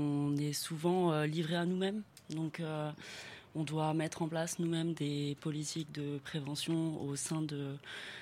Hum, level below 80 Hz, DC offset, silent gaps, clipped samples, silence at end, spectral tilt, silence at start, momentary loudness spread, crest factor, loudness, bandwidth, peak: none; -76 dBFS; under 0.1%; none; under 0.1%; 0 s; -5.5 dB/octave; 0 s; 10 LU; 16 dB; -37 LUFS; 16 kHz; -20 dBFS